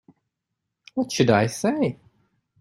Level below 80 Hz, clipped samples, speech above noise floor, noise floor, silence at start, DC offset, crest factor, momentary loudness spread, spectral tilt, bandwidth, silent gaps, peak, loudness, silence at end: -60 dBFS; under 0.1%; 60 dB; -82 dBFS; 0.95 s; under 0.1%; 20 dB; 12 LU; -5.5 dB/octave; 15.5 kHz; none; -4 dBFS; -23 LUFS; 0.65 s